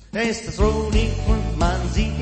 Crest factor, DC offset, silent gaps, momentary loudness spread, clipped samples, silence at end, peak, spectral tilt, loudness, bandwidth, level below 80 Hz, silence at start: 16 dB; under 0.1%; none; 3 LU; under 0.1%; 0 s; -4 dBFS; -6 dB/octave; -22 LUFS; 8.8 kHz; -24 dBFS; 0.15 s